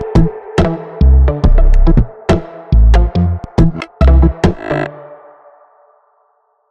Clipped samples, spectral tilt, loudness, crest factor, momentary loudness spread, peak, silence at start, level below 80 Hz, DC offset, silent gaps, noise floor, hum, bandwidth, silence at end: under 0.1%; -8.5 dB/octave; -13 LUFS; 12 dB; 7 LU; 0 dBFS; 0 s; -12 dBFS; under 0.1%; none; -58 dBFS; none; 7.2 kHz; 1.55 s